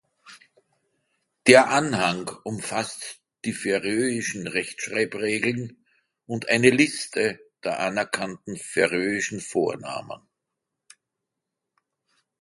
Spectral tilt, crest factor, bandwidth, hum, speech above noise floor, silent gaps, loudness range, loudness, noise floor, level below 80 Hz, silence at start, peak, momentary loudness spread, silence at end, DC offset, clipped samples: -4 dB/octave; 26 dB; 11.5 kHz; none; 60 dB; none; 6 LU; -24 LUFS; -84 dBFS; -64 dBFS; 0.25 s; 0 dBFS; 16 LU; 2.25 s; under 0.1%; under 0.1%